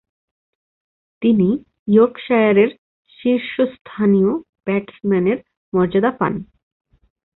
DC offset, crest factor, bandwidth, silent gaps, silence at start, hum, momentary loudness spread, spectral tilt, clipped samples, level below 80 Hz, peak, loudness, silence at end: under 0.1%; 16 dB; 4.1 kHz; 1.79-1.86 s, 2.78-3.05 s, 3.81-3.85 s, 4.49-4.53 s, 5.57-5.72 s; 1.2 s; none; 9 LU; -12 dB/octave; under 0.1%; -54 dBFS; -2 dBFS; -18 LUFS; 0.95 s